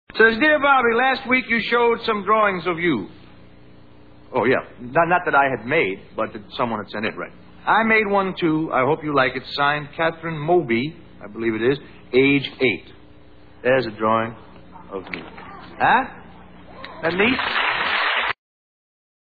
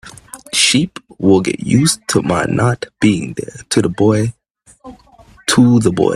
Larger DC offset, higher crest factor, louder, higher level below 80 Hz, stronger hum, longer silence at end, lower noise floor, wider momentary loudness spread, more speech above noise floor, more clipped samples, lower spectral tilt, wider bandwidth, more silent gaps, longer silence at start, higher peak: first, 0.4% vs under 0.1%; about the same, 20 dB vs 16 dB; second, -20 LUFS vs -14 LUFS; second, -54 dBFS vs -46 dBFS; neither; first, 0.9 s vs 0 s; about the same, -48 dBFS vs -45 dBFS; first, 15 LU vs 11 LU; second, 28 dB vs 32 dB; neither; first, -8 dB/octave vs -4.5 dB/octave; second, 4.9 kHz vs 14.5 kHz; neither; about the same, 0.15 s vs 0.05 s; about the same, -2 dBFS vs 0 dBFS